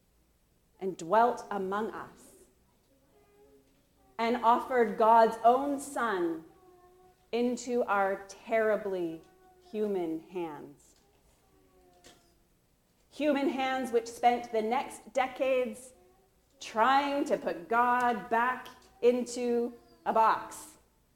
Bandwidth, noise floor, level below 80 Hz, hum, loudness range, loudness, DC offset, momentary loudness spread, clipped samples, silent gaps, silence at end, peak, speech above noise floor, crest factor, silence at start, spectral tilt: 17 kHz; -69 dBFS; -70 dBFS; none; 10 LU; -30 LUFS; under 0.1%; 14 LU; under 0.1%; none; 0.45 s; -12 dBFS; 40 dB; 20 dB; 0.8 s; -4.5 dB/octave